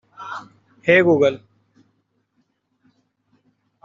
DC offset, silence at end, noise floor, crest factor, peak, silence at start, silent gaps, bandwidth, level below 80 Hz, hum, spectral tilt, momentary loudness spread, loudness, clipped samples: under 0.1%; 2.5 s; -69 dBFS; 20 dB; -2 dBFS; 0.2 s; none; 7.4 kHz; -66 dBFS; none; -4.5 dB/octave; 21 LU; -16 LUFS; under 0.1%